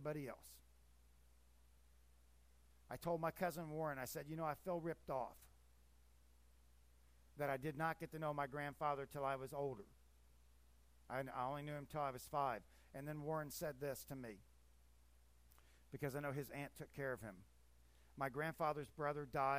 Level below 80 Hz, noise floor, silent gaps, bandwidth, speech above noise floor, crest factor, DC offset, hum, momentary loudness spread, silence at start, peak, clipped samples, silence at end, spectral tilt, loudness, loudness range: -70 dBFS; -71 dBFS; none; 15.5 kHz; 25 dB; 20 dB; under 0.1%; 60 Hz at -70 dBFS; 13 LU; 0 s; -28 dBFS; under 0.1%; 0 s; -6 dB/octave; -46 LUFS; 5 LU